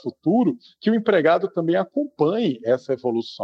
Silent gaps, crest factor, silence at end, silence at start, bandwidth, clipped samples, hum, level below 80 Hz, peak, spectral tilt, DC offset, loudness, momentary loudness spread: none; 16 dB; 0 s; 0.05 s; 7.4 kHz; under 0.1%; none; -74 dBFS; -4 dBFS; -8 dB/octave; under 0.1%; -21 LUFS; 6 LU